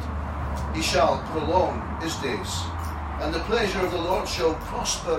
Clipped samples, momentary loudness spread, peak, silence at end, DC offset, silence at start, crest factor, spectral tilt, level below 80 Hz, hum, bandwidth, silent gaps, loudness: under 0.1%; 8 LU; -10 dBFS; 0 s; under 0.1%; 0 s; 16 dB; -4.5 dB/octave; -36 dBFS; none; 16 kHz; none; -26 LUFS